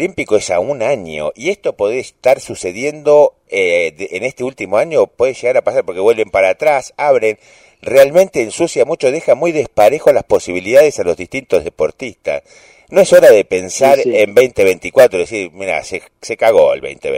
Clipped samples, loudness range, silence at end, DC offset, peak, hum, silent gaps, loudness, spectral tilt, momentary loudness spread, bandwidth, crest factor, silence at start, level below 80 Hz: 0.2%; 4 LU; 0 s; under 0.1%; 0 dBFS; none; none; -13 LUFS; -4 dB/octave; 11 LU; 16.5 kHz; 12 dB; 0 s; -50 dBFS